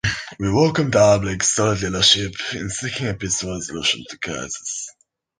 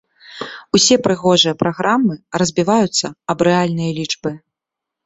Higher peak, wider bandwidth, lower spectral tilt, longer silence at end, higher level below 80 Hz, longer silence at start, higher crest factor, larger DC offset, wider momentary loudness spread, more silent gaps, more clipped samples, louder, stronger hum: about the same, -2 dBFS vs 0 dBFS; first, 10 kHz vs 8.4 kHz; about the same, -3 dB/octave vs -4 dB/octave; second, 0.5 s vs 0.7 s; first, -44 dBFS vs -54 dBFS; second, 0.05 s vs 0.3 s; about the same, 18 dB vs 16 dB; neither; about the same, 13 LU vs 13 LU; neither; neither; second, -20 LUFS vs -16 LUFS; neither